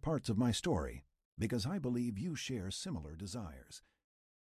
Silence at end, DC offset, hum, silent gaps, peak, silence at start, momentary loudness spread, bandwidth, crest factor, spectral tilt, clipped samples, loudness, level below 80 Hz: 0.75 s; under 0.1%; none; 1.25-1.37 s; -22 dBFS; 0.05 s; 20 LU; 14 kHz; 16 dB; -5.5 dB/octave; under 0.1%; -39 LUFS; -54 dBFS